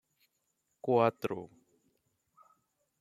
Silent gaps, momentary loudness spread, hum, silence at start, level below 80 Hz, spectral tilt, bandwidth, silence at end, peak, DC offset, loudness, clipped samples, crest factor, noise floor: none; 16 LU; none; 0.85 s; -80 dBFS; -7.5 dB/octave; 15 kHz; 1.55 s; -12 dBFS; under 0.1%; -32 LUFS; under 0.1%; 24 dB; -80 dBFS